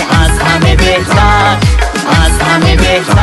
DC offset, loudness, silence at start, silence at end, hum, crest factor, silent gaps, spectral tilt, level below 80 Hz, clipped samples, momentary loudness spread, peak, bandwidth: under 0.1%; -8 LUFS; 0 s; 0 s; none; 8 dB; none; -5 dB/octave; -14 dBFS; 0.6%; 3 LU; 0 dBFS; 12.5 kHz